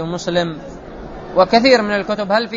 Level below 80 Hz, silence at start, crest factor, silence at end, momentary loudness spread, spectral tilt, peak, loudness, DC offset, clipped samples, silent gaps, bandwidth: -42 dBFS; 0 s; 16 dB; 0 s; 21 LU; -5 dB/octave; 0 dBFS; -16 LUFS; under 0.1%; under 0.1%; none; 7.8 kHz